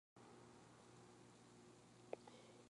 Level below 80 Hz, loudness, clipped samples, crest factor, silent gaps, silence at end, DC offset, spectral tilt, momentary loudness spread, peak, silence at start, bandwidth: -88 dBFS; -63 LUFS; under 0.1%; 30 dB; none; 0 s; under 0.1%; -4.5 dB/octave; 9 LU; -32 dBFS; 0.15 s; 11 kHz